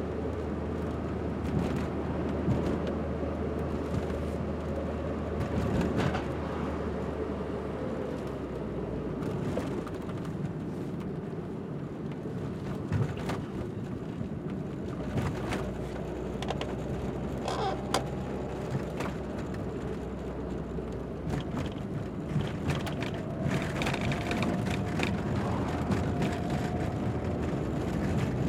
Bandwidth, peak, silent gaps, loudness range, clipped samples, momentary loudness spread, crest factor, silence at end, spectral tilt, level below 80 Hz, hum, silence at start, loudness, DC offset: 15.5 kHz; -10 dBFS; none; 5 LU; under 0.1%; 6 LU; 22 dB; 0 s; -7 dB/octave; -44 dBFS; none; 0 s; -33 LUFS; under 0.1%